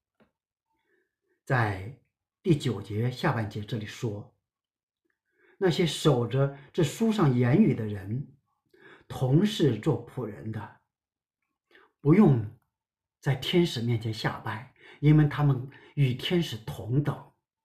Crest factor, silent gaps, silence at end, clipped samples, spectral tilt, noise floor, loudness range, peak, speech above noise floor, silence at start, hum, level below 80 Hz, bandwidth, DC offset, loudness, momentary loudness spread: 18 dB; 4.83-4.88 s; 0.4 s; under 0.1%; -7 dB/octave; under -90 dBFS; 5 LU; -10 dBFS; over 64 dB; 1.5 s; none; -56 dBFS; 14.5 kHz; under 0.1%; -27 LUFS; 15 LU